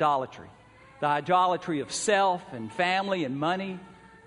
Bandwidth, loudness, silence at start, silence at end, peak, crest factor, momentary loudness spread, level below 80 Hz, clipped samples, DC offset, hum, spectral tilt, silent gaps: 10.5 kHz; -27 LUFS; 0 s; 0.35 s; -10 dBFS; 18 dB; 14 LU; -68 dBFS; under 0.1%; under 0.1%; none; -4 dB/octave; none